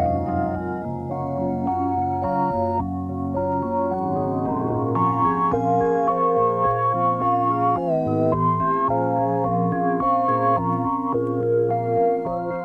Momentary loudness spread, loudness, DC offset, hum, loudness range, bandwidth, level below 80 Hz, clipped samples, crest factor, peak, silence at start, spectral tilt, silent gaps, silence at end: 6 LU; -22 LUFS; under 0.1%; none; 4 LU; 7 kHz; -48 dBFS; under 0.1%; 12 dB; -8 dBFS; 0 s; -10.5 dB/octave; none; 0 s